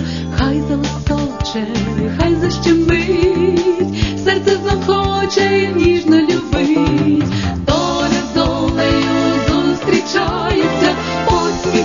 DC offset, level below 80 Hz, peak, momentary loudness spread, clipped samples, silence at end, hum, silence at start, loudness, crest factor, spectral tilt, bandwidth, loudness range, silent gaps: 0.4%; -28 dBFS; -2 dBFS; 5 LU; under 0.1%; 0 s; none; 0 s; -15 LUFS; 14 dB; -5.5 dB/octave; 7.4 kHz; 1 LU; none